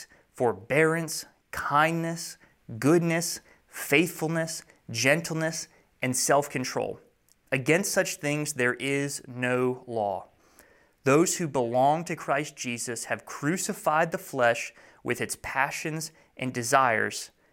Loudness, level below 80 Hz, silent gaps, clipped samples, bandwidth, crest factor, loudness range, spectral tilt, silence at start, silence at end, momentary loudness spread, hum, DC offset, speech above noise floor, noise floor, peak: -27 LUFS; -66 dBFS; none; under 0.1%; 17 kHz; 22 dB; 2 LU; -4 dB/octave; 0 s; 0.25 s; 12 LU; none; under 0.1%; 32 dB; -59 dBFS; -6 dBFS